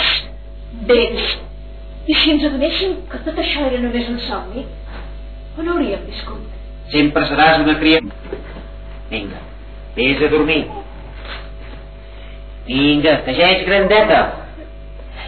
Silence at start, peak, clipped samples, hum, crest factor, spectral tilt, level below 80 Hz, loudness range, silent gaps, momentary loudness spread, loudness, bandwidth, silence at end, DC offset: 0 s; 0 dBFS; under 0.1%; 50 Hz at -30 dBFS; 18 dB; -7.5 dB/octave; -32 dBFS; 7 LU; none; 23 LU; -15 LUFS; 4.6 kHz; 0 s; 0.6%